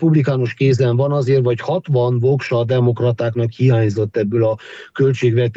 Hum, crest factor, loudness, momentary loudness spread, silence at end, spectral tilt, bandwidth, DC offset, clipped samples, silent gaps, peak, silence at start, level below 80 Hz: none; 14 dB; -17 LUFS; 4 LU; 0.05 s; -8.5 dB/octave; 7.8 kHz; under 0.1%; under 0.1%; none; -2 dBFS; 0 s; -58 dBFS